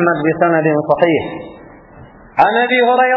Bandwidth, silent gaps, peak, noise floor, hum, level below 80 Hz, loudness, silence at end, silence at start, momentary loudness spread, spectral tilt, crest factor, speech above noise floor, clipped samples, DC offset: 5.6 kHz; none; 0 dBFS; -39 dBFS; none; -50 dBFS; -14 LUFS; 0 s; 0 s; 14 LU; -8.5 dB/octave; 14 dB; 26 dB; under 0.1%; under 0.1%